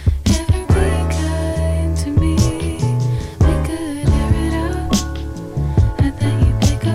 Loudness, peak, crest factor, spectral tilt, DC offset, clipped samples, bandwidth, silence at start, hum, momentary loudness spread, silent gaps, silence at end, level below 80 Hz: -18 LUFS; 0 dBFS; 16 dB; -6.5 dB/octave; under 0.1%; under 0.1%; 14.5 kHz; 0 s; none; 5 LU; none; 0 s; -22 dBFS